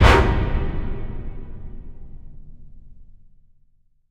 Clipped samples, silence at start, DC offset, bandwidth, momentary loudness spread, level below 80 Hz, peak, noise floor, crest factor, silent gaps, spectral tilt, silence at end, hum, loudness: under 0.1%; 0 s; 0.5%; 11.5 kHz; 28 LU; -26 dBFS; 0 dBFS; -58 dBFS; 22 dB; none; -6 dB/octave; 1.05 s; none; -22 LUFS